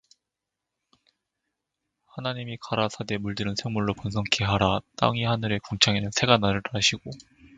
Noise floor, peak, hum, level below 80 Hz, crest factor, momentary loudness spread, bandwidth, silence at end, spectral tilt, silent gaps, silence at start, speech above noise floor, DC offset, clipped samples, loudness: -86 dBFS; 0 dBFS; none; -50 dBFS; 26 dB; 12 LU; 9.4 kHz; 0.1 s; -4 dB/octave; none; 2.15 s; 60 dB; under 0.1%; under 0.1%; -25 LUFS